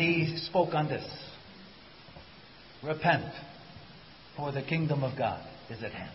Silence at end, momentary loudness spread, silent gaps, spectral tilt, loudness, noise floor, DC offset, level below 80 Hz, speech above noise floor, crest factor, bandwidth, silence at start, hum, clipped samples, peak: 0 s; 23 LU; none; -10 dB/octave; -31 LUFS; -53 dBFS; under 0.1%; -60 dBFS; 22 dB; 20 dB; 5.8 kHz; 0 s; none; under 0.1%; -12 dBFS